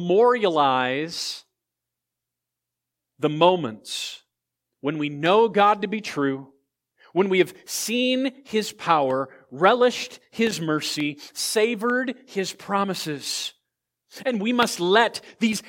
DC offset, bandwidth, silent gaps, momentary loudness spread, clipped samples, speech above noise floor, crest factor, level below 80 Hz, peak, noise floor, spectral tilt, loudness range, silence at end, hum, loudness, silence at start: under 0.1%; 17 kHz; none; 11 LU; under 0.1%; 63 dB; 22 dB; -74 dBFS; -2 dBFS; -85 dBFS; -4 dB/octave; 4 LU; 0 s; none; -23 LUFS; 0 s